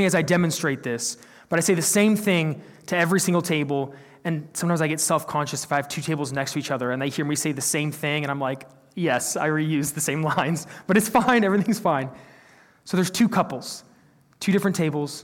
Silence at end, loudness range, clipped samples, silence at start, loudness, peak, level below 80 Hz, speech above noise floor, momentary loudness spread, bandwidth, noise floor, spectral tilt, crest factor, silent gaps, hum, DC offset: 0 s; 3 LU; under 0.1%; 0 s; -23 LUFS; -8 dBFS; -64 dBFS; 34 dB; 10 LU; 17.5 kHz; -57 dBFS; -4.5 dB/octave; 16 dB; none; none; under 0.1%